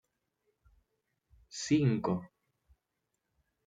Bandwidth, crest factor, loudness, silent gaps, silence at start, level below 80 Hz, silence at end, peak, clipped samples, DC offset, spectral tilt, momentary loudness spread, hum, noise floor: 9.4 kHz; 20 dB; -32 LUFS; none; 1.55 s; -68 dBFS; 1.4 s; -16 dBFS; under 0.1%; under 0.1%; -6 dB/octave; 13 LU; none; -85 dBFS